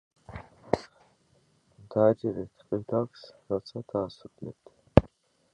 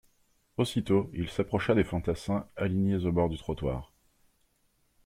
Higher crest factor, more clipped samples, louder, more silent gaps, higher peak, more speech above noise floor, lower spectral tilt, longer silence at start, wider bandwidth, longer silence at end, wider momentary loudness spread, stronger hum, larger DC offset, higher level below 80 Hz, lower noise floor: first, 30 dB vs 20 dB; neither; about the same, -29 LUFS vs -30 LUFS; neither; first, 0 dBFS vs -12 dBFS; second, 37 dB vs 42 dB; first, -8.5 dB/octave vs -7 dB/octave; second, 0.3 s vs 0.6 s; second, 9.6 kHz vs 15.5 kHz; second, 0.45 s vs 1.2 s; first, 22 LU vs 7 LU; neither; neither; about the same, -46 dBFS vs -50 dBFS; second, -67 dBFS vs -71 dBFS